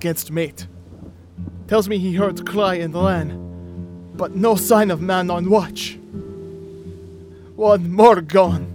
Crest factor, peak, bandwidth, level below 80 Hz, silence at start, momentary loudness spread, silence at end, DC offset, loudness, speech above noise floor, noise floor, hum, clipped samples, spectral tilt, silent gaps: 18 dB; 0 dBFS; 18.5 kHz; -52 dBFS; 0 s; 21 LU; 0 s; under 0.1%; -18 LUFS; 23 dB; -40 dBFS; none; under 0.1%; -5.5 dB/octave; none